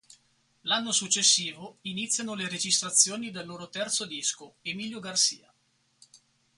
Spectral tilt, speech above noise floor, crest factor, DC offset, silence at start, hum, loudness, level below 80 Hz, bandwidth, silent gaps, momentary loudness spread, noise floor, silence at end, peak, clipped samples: -0.5 dB/octave; 41 dB; 26 dB; under 0.1%; 0.65 s; none; -26 LUFS; -76 dBFS; 12 kHz; none; 16 LU; -71 dBFS; 0.4 s; -4 dBFS; under 0.1%